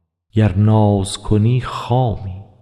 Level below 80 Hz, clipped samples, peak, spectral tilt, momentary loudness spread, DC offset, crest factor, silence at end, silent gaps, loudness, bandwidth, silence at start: -36 dBFS; under 0.1%; -4 dBFS; -7.5 dB/octave; 9 LU; under 0.1%; 12 dB; 0.2 s; none; -17 LUFS; 11.5 kHz; 0.35 s